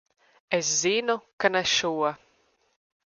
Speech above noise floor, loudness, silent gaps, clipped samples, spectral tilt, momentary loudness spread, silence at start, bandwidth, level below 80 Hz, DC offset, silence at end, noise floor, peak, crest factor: 42 dB; -25 LUFS; 1.33-1.38 s; under 0.1%; -1.5 dB/octave; 7 LU; 0.5 s; 10.5 kHz; -68 dBFS; under 0.1%; 1.05 s; -67 dBFS; -6 dBFS; 22 dB